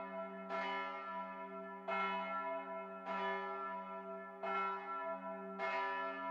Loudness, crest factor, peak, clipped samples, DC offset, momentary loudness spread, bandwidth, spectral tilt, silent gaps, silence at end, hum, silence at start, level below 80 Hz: -42 LUFS; 16 dB; -28 dBFS; under 0.1%; under 0.1%; 8 LU; 8 kHz; -6 dB/octave; none; 0 s; none; 0 s; under -90 dBFS